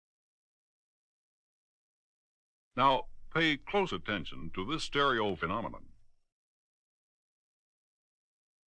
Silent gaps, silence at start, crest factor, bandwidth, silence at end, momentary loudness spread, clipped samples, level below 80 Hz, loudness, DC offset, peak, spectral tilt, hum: none; 2.75 s; 24 dB; 10 kHz; 2.8 s; 12 LU; under 0.1%; -54 dBFS; -32 LUFS; under 0.1%; -12 dBFS; -5 dB/octave; none